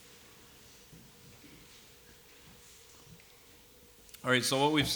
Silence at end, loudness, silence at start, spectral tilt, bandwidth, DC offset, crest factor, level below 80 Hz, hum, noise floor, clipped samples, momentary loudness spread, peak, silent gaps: 0 s; -29 LUFS; 0.95 s; -3.5 dB/octave; over 20 kHz; under 0.1%; 24 dB; -62 dBFS; none; -58 dBFS; under 0.1%; 28 LU; -12 dBFS; none